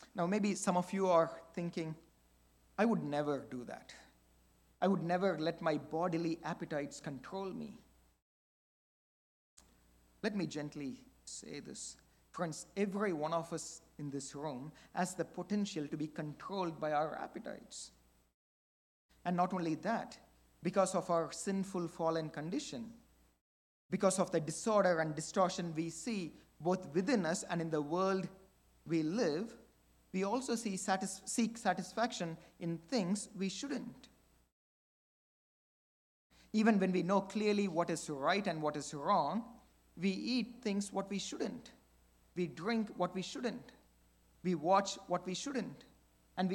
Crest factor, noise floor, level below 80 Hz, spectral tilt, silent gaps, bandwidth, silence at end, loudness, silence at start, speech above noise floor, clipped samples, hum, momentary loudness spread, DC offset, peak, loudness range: 22 dB; -70 dBFS; -72 dBFS; -5 dB/octave; 8.22-9.57 s, 18.34-19.09 s, 23.41-23.89 s, 34.52-36.30 s; 17 kHz; 0 s; -37 LUFS; 0 s; 33 dB; under 0.1%; none; 14 LU; under 0.1%; -16 dBFS; 8 LU